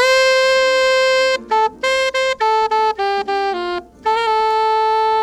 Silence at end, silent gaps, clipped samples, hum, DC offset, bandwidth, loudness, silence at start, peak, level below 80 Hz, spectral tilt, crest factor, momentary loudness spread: 0 s; none; under 0.1%; none; under 0.1%; 14.5 kHz; -16 LUFS; 0 s; -4 dBFS; -52 dBFS; -1 dB/octave; 12 dB; 7 LU